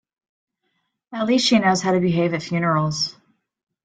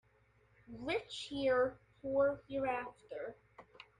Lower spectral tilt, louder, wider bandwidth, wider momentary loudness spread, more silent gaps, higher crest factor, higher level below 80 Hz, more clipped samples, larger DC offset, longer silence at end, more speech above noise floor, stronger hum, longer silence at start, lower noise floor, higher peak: about the same, -5 dB/octave vs -5 dB/octave; first, -20 LUFS vs -37 LUFS; second, 9.4 kHz vs 10.5 kHz; second, 9 LU vs 15 LU; neither; about the same, 16 dB vs 16 dB; first, -60 dBFS vs -68 dBFS; neither; neither; first, 0.75 s vs 0.15 s; first, 54 dB vs 34 dB; neither; first, 1.1 s vs 0.7 s; about the same, -73 dBFS vs -71 dBFS; first, -6 dBFS vs -22 dBFS